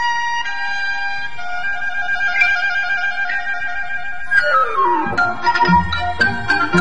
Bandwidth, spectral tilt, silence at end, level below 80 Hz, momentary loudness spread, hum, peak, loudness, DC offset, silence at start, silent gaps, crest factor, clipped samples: 10 kHz; -4.5 dB/octave; 0 s; -42 dBFS; 9 LU; none; -2 dBFS; -17 LUFS; 6%; 0 s; none; 16 dB; under 0.1%